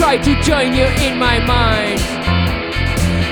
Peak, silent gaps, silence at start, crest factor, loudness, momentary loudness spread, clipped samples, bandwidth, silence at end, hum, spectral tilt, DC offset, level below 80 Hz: 0 dBFS; none; 0 s; 14 dB; -15 LUFS; 5 LU; under 0.1%; 19.5 kHz; 0 s; none; -5 dB/octave; under 0.1%; -22 dBFS